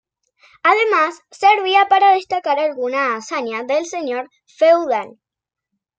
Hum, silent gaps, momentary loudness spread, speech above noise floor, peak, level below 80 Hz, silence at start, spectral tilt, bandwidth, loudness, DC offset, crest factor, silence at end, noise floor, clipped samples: none; none; 11 LU; 38 dB; -2 dBFS; -70 dBFS; 0.65 s; -2 dB/octave; 8.8 kHz; -17 LUFS; under 0.1%; 16 dB; 0.9 s; -55 dBFS; under 0.1%